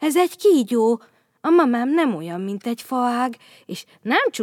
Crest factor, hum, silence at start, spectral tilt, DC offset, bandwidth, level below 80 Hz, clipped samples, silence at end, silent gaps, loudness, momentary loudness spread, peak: 16 dB; none; 0 s; -4.5 dB/octave; under 0.1%; 17 kHz; -84 dBFS; under 0.1%; 0 s; none; -20 LUFS; 15 LU; -4 dBFS